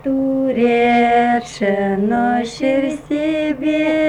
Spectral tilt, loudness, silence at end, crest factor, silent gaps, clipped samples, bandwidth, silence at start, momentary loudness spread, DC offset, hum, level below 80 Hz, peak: -6 dB/octave; -17 LUFS; 0 s; 12 dB; none; under 0.1%; 10.5 kHz; 0.05 s; 6 LU; under 0.1%; none; -48 dBFS; -4 dBFS